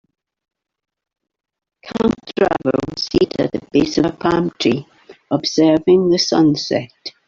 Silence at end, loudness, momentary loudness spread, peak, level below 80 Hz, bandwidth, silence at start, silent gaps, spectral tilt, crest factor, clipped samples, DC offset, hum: 0.2 s; -17 LUFS; 8 LU; -2 dBFS; -46 dBFS; 7.4 kHz; 1.85 s; none; -5.5 dB/octave; 16 dB; under 0.1%; under 0.1%; none